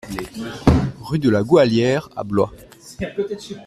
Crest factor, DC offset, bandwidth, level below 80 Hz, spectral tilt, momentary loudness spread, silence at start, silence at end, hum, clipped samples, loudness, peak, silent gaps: 18 dB; under 0.1%; 14 kHz; -36 dBFS; -7 dB/octave; 14 LU; 0.05 s; 0 s; none; under 0.1%; -19 LUFS; -2 dBFS; none